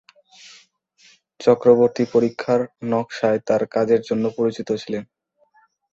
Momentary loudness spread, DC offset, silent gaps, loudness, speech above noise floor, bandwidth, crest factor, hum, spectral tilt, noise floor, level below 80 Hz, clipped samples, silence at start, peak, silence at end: 10 LU; under 0.1%; none; -20 LUFS; 41 dB; 7.6 kHz; 20 dB; none; -6.5 dB/octave; -60 dBFS; -62 dBFS; under 0.1%; 1.4 s; -2 dBFS; 0.9 s